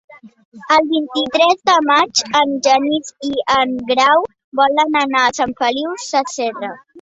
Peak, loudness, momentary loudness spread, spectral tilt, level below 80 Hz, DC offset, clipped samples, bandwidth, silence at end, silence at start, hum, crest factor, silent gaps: 0 dBFS; -15 LUFS; 9 LU; -2 dB/octave; -58 dBFS; under 0.1%; under 0.1%; 8.2 kHz; 0 s; 0.1 s; none; 16 dB; 0.45-0.52 s, 4.44-4.52 s